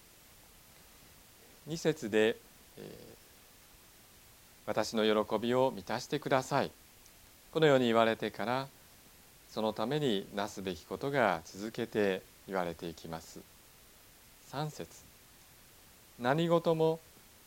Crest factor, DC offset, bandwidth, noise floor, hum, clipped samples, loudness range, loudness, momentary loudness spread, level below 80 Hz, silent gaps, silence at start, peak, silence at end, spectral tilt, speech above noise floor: 24 dB; under 0.1%; 17 kHz; -59 dBFS; none; under 0.1%; 8 LU; -33 LUFS; 18 LU; -66 dBFS; none; 1.65 s; -12 dBFS; 0.45 s; -5 dB/octave; 27 dB